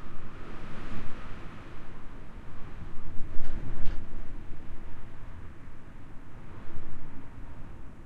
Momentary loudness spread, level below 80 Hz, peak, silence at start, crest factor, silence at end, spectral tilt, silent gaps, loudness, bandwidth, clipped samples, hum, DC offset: 8 LU; -38 dBFS; -8 dBFS; 0 s; 16 dB; 0 s; -7 dB/octave; none; -45 LUFS; 3.5 kHz; under 0.1%; none; under 0.1%